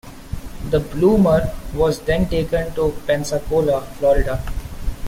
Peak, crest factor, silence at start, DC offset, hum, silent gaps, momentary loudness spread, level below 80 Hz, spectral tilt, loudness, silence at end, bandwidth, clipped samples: -4 dBFS; 16 dB; 0.05 s; under 0.1%; none; none; 16 LU; -28 dBFS; -6.5 dB/octave; -19 LUFS; 0 s; 16.5 kHz; under 0.1%